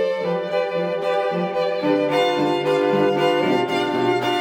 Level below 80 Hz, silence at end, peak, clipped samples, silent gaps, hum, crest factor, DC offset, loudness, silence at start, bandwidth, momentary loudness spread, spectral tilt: -66 dBFS; 0 s; -6 dBFS; under 0.1%; none; none; 14 dB; under 0.1%; -20 LUFS; 0 s; 16.5 kHz; 4 LU; -6 dB/octave